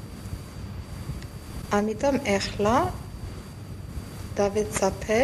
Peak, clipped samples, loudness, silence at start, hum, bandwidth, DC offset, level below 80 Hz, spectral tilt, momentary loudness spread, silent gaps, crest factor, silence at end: -10 dBFS; under 0.1%; -27 LUFS; 0 s; none; 15.5 kHz; under 0.1%; -42 dBFS; -5 dB/octave; 15 LU; none; 18 dB; 0 s